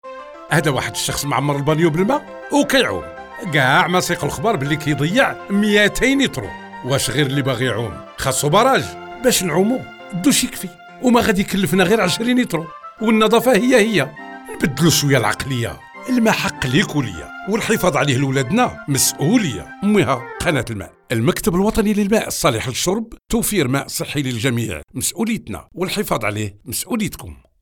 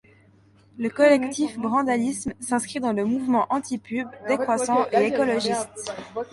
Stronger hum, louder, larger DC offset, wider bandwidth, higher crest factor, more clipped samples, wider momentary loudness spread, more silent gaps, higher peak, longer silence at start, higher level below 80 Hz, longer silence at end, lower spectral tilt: neither; first, -18 LUFS vs -24 LUFS; neither; first, 19 kHz vs 11.5 kHz; about the same, 16 dB vs 18 dB; neither; about the same, 12 LU vs 11 LU; neither; first, -2 dBFS vs -6 dBFS; second, 0.05 s vs 0.75 s; first, -42 dBFS vs -62 dBFS; first, 0.3 s vs 0.05 s; about the same, -4.5 dB/octave vs -4 dB/octave